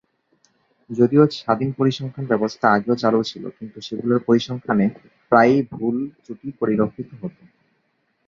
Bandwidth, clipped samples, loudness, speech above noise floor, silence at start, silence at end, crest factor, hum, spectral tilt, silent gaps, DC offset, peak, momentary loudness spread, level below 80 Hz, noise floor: 7.4 kHz; under 0.1%; -20 LUFS; 49 dB; 0.9 s; 0.95 s; 20 dB; none; -7 dB/octave; none; under 0.1%; -2 dBFS; 18 LU; -60 dBFS; -68 dBFS